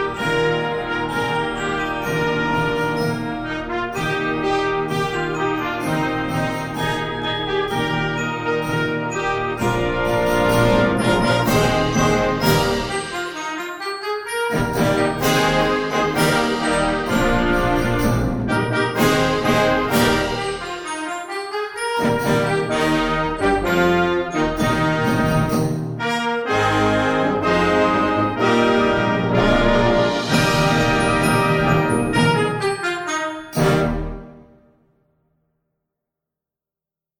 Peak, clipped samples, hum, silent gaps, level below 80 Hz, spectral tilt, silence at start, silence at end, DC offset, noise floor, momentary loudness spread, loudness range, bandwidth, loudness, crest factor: -2 dBFS; under 0.1%; none; none; -36 dBFS; -5 dB/octave; 0 s; 2.8 s; under 0.1%; -89 dBFS; 8 LU; 5 LU; 19.5 kHz; -19 LUFS; 16 dB